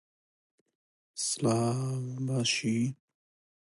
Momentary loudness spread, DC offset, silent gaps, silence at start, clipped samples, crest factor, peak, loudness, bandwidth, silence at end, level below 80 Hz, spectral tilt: 7 LU; under 0.1%; none; 1.15 s; under 0.1%; 18 dB; -16 dBFS; -30 LUFS; 11.5 kHz; 0.7 s; -72 dBFS; -4.5 dB/octave